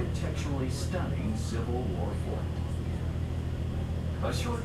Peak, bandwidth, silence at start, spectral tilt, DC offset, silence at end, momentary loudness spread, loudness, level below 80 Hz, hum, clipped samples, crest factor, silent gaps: -18 dBFS; 13.5 kHz; 0 s; -6.5 dB/octave; under 0.1%; 0 s; 2 LU; -33 LUFS; -38 dBFS; none; under 0.1%; 12 dB; none